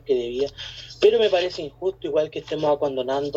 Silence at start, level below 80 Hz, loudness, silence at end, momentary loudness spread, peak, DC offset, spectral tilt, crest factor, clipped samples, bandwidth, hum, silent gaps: 0.05 s; -54 dBFS; -23 LUFS; 0 s; 10 LU; -6 dBFS; under 0.1%; -5 dB/octave; 18 dB; under 0.1%; 7.8 kHz; none; none